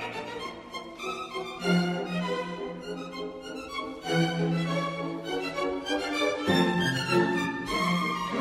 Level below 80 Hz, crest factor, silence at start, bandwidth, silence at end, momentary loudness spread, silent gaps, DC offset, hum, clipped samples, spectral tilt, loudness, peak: -58 dBFS; 18 dB; 0 s; 15.5 kHz; 0 s; 12 LU; none; under 0.1%; none; under 0.1%; -5.5 dB/octave; -29 LUFS; -12 dBFS